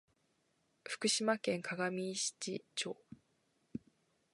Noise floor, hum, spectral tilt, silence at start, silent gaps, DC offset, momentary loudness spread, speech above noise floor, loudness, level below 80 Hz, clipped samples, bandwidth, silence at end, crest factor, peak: -78 dBFS; none; -2.5 dB/octave; 0.85 s; none; under 0.1%; 17 LU; 40 dB; -37 LUFS; -82 dBFS; under 0.1%; 11.5 kHz; 0.55 s; 22 dB; -18 dBFS